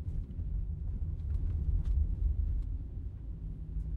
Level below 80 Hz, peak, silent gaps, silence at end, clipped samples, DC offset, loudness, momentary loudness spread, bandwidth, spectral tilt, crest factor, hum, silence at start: -34 dBFS; -20 dBFS; none; 0 s; under 0.1%; under 0.1%; -37 LUFS; 10 LU; 1.7 kHz; -10.5 dB/octave; 14 dB; none; 0 s